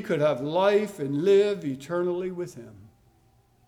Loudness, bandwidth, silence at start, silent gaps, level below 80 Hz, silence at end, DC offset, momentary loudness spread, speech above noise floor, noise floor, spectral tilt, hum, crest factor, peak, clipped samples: -25 LUFS; 13.5 kHz; 0 s; none; -68 dBFS; 0.85 s; under 0.1%; 14 LU; 37 dB; -62 dBFS; -6.5 dB/octave; none; 16 dB; -10 dBFS; under 0.1%